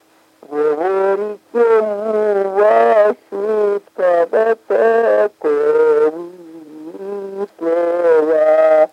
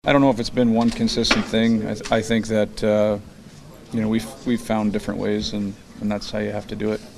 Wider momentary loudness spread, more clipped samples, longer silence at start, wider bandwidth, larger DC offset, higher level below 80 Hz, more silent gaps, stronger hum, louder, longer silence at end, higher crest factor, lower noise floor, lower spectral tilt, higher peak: first, 15 LU vs 9 LU; neither; first, 0.5 s vs 0.05 s; second, 9 kHz vs 13 kHz; neither; second, -76 dBFS vs -42 dBFS; neither; neither; first, -15 LUFS vs -22 LUFS; about the same, 0.05 s vs 0 s; second, 12 dB vs 20 dB; first, -46 dBFS vs -42 dBFS; about the same, -6 dB/octave vs -5.5 dB/octave; about the same, -2 dBFS vs 0 dBFS